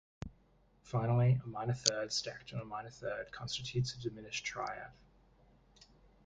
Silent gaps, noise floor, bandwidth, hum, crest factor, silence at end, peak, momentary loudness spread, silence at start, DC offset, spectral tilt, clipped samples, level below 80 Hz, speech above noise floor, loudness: none; -68 dBFS; 9.4 kHz; none; 30 dB; 1.35 s; -8 dBFS; 15 LU; 0.25 s; under 0.1%; -4.5 dB/octave; under 0.1%; -62 dBFS; 32 dB; -37 LUFS